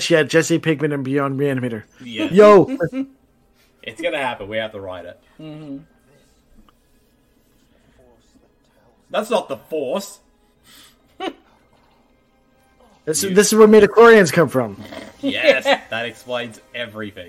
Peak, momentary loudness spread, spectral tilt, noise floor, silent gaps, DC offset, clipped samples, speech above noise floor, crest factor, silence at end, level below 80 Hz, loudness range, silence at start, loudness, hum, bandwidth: -2 dBFS; 24 LU; -4.5 dB/octave; -58 dBFS; none; under 0.1%; under 0.1%; 41 dB; 18 dB; 0.05 s; -56 dBFS; 18 LU; 0 s; -16 LUFS; none; 15 kHz